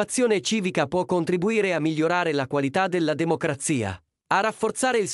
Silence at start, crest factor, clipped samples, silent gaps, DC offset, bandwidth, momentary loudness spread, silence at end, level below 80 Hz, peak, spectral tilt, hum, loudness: 0 s; 16 dB; under 0.1%; none; under 0.1%; 13.5 kHz; 3 LU; 0 s; -62 dBFS; -6 dBFS; -4.5 dB/octave; none; -24 LUFS